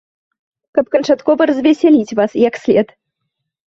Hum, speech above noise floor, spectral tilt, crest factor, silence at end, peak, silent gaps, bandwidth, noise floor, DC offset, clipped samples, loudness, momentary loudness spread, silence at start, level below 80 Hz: none; 62 dB; -6 dB/octave; 14 dB; 0.85 s; -2 dBFS; none; 7.6 kHz; -75 dBFS; under 0.1%; under 0.1%; -14 LUFS; 7 LU; 0.75 s; -56 dBFS